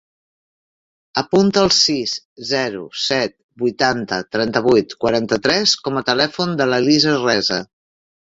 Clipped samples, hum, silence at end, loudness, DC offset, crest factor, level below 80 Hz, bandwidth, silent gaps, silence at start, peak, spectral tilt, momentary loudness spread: under 0.1%; none; 0.75 s; -17 LUFS; under 0.1%; 18 dB; -54 dBFS; 7.8 kHz; 2.25-2.36 s, 3.43-3.49 s; 1.15 s; -2 dBFS; -3.5 dB/octave; 10 LU